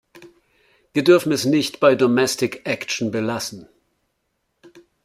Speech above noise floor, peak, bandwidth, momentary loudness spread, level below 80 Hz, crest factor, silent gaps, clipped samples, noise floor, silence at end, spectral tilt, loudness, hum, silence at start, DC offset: 54 dB; -2 dBFS; 15.5 kHz; 10 LU; -64 dBFS; 20 dB; none; under 0.1%; -72 dBFS; 1.4 s; -4.5 dB/octave; -19 LUFS; none; 0.15 s; under 0.1%